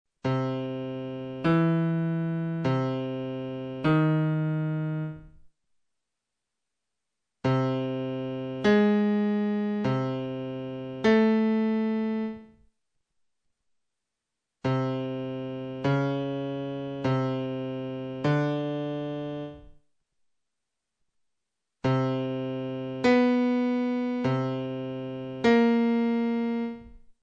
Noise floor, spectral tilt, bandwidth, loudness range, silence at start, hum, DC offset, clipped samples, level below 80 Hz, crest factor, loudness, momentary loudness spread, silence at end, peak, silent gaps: -86 dBFS; -8.5 dB/octave; 7.4 kHz; 8 LU; 0.25 s; none; under 0.1%; under 0.1%; -62 dBFS; 16 dB; -28 LUFS; 12 LU; 0.1 s; -12 dBFS; none